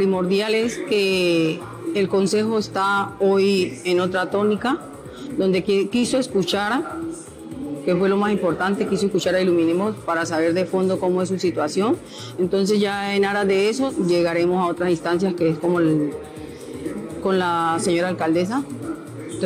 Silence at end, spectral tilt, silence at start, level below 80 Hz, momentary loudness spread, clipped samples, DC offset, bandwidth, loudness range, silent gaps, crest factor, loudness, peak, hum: 0 s; -5.5 dB/octave; 0 s; -54 dBFS; 11 LU; under 0.1%; under 0.1%; 15.5 kHz; 2 LU; none; 10 dB; -21 LUFS; -10 dBFS; none